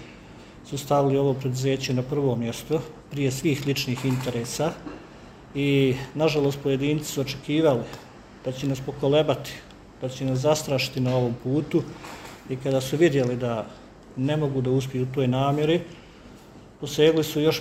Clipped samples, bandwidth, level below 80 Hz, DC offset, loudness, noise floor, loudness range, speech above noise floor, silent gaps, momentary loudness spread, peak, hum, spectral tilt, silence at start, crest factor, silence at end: under 0.1%; 16 kHz; -52 dBFS; under 0.1%; -25 LUFS; -47 dBFS; 2 LU; 23 dB; none; 17 LU; -6 dBFS; none; -6 dB/octave; 0 s; 20 dB; 0 s